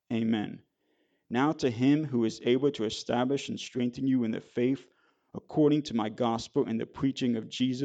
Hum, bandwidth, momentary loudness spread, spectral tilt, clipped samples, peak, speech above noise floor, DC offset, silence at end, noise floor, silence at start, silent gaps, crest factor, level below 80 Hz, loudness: none; 8.8 kHz; 9 LU; -6 dB/octave; under 0.1%; -14 dBFS; 45 dB; under 0.1%; 0 s; -73 dBFS; 0.1 s; none; 16 dB; -66 dBFS; -29 LUFS